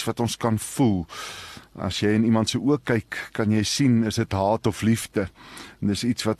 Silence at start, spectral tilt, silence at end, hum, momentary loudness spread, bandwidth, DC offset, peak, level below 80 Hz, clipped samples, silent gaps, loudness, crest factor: 0 s; -5.5 dB/octave; 0.05 s; none; 13 LU; 13 kHz; under 0.1%; -8 dBFS; -52 dBFS; under 0.1%; none; -24 LUFS; 16 dB